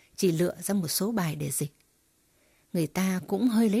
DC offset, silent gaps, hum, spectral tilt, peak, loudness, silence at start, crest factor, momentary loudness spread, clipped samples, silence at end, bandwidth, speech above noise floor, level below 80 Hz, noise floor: under 0.1%; none; none; -5 dB/octave; -12 dBFS; -28 LUFS; 0.2 s; 16 dB; 7 LU; under 0.1%; 0 s; 16 kHz; 41 dB; -64 dBFS; -68 dBFS